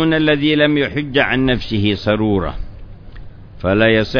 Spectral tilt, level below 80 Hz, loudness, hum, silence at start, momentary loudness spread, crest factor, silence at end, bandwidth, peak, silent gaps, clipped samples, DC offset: -7.5 dB/octave; -32 dBFS; -16 LUFS; none; 0 s; 10 LU; 16 dB; 0 s; 5.4 kHz; 0 dBFS; none; under 0.1%; under 0.1%